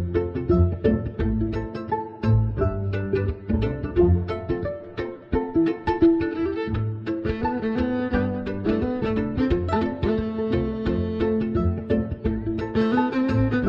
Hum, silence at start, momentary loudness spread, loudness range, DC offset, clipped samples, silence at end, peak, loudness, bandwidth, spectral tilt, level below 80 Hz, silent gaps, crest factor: none; 0 s; 7 LU; 1 LU; under 0.1%; under 0.1%; 0 s; -6 dBFS; -24 LUFS; 5.8 kHz; -10 dB/octave; -34 dBFS; none; 18 dB